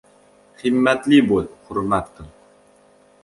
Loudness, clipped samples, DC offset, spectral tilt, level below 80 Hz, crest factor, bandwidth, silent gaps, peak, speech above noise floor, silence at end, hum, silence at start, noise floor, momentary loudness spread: -19 LUFS; under 0.1%; under 0.1%; -6 dB/octave; -48 dBFS; 18 dB; 11.5 kHz; none; -2 dBFS; 35 dB; 1 s; none; 0.65 s; -53 dBFS; 12 LU